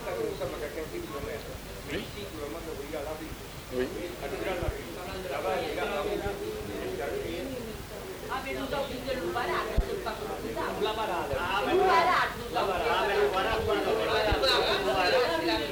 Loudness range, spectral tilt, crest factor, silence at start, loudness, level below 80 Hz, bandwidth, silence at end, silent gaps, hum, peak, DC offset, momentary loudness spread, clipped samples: 10 LU; -4 dB/octave; 16 dB; 0 s; -30 LUFS; -44 dBFS; over 20 kHz; 0 s; none; none; -14 dBFS; under 0.1%; 13 LU; under 0.1%